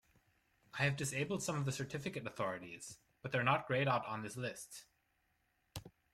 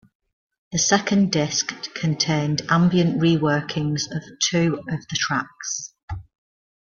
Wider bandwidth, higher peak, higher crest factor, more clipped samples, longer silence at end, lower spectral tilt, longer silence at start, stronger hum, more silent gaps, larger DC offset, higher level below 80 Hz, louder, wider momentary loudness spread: first, 15.5 kHz vs 7.6 kHz; second, -20 dBFS vs -2 dBFS; about the same, 22 dB vs 20 dB; neither; second, 0.25 s vs 0.65 s; about the same, -4.5 dB/octave vs -4 dB/octave; about the same, 0.75 s vs 0.7 s; neither; second, none vs 6.03-6.08 s; neither; second, -72 dBFS vs -52 dBFS; second, -38 LUFS vs -22 LUFS; first, 18 LU vs 10 LU